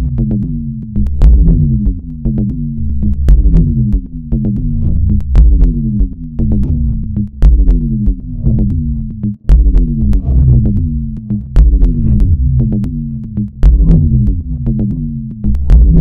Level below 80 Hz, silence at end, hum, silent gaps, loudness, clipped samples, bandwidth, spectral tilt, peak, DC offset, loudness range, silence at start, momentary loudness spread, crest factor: -12 dBFS; 0 s; none; none; -13 LUFS; under 0.1%; 2 kHz; -11.5 dB/octave; 0 dBFS; under 0.1%; 2 LU; 0 s; 9 LU; 10 dB